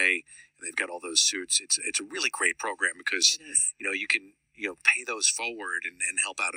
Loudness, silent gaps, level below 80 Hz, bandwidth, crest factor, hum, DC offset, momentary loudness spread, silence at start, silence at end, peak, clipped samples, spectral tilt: -25 LUFS; none; -76 dBFS; 18 kHz; 24 dB; none; under 0.1%; 9 LU; 0 s; 0 s; -6 dBFS; under 0.1%; 2 dB/octave